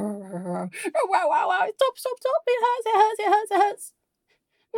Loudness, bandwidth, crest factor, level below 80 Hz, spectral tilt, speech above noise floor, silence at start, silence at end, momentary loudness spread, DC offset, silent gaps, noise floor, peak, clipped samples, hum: -23 LUFS; 16.5 kHz; 18 dB; -88 dBFS; -4 dB/octave; 49 dB; 0 s; 0 s; 11 LU; under 0.1%; none; -72 dBFS; -6 dBFS; under 0.1%; none